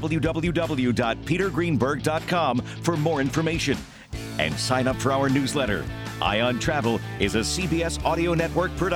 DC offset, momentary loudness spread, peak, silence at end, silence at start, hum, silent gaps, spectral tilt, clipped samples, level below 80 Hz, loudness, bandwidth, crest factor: under 0.1%; 4 LU; -6 dBFS; 0 s; 0 s; none; none; -5 dB/octave; under 0.1%; -40 dBFS; -24 LUFS; 17 kHz; 18 dB